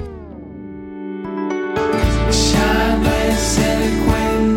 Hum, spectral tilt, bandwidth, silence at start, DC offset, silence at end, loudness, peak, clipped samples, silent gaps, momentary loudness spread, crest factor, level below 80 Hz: none; -4.5 dB/octave; 16.5 kHz; 0 s; under 0.1%; 0 s; -17 LUFS; -4 dBFS; under 0.1%; none; 18 LU; 12 dB; -24 dBFS